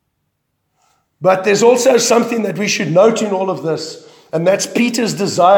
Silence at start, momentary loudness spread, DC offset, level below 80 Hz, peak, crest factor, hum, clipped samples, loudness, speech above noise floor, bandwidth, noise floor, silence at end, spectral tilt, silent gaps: 1.2 s; 9 LU; under 0.1%; -68 dBFS; 0 dBFS; 14 dB; none; under 0.1%; -14 LUFS; 56 dB; 19 kHz; -69 dBFS; 0 s; -4 dB/octave; none